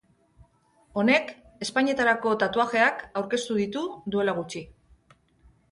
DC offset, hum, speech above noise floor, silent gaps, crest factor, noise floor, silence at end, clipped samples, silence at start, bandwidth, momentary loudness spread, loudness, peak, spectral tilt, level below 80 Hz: under 0.1%; none; 37 dB; none; 18 dB; -63 dBFS; 1 s; under 0.1%; 0.95 s; 11.5 kHz; 13 LU; -25 LUFS; -8 dBFS; -4.5 dB/octave; -62 dBFS